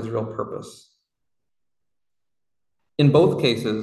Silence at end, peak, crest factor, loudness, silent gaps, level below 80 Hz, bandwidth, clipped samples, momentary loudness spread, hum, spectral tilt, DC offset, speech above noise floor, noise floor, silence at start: 0 s; -4 dBFS; 20 dB; -20 LUFS; none; -58 dBFS; 12.5 kHz; under 0.1%; 17 LU; none; -7 dB/octave; under 0.1%; 69 dB; -89 dBFS; 0 s